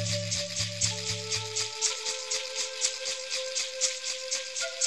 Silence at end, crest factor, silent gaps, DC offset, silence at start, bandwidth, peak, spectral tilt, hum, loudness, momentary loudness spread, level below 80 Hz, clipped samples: 0 s; 20 dB; none; 0.2%; 0 s; 14.5 kHz; -10 dBFS; -1 dB/octave; none; -29 LUFS; 4 LU; -62 dBFS; under 0.1%